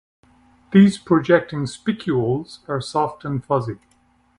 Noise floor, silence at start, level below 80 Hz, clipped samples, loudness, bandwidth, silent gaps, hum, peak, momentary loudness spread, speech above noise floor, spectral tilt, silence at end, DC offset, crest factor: -60 dBFS; 0.7 s; -54 dBFS; under 0.1%; -20 LUFS; 11 kHz; none; none; -2 dBFS; 13 LU; 40 dB; -7 dB/octave; 0.65 s; under 0.1%; 20 dB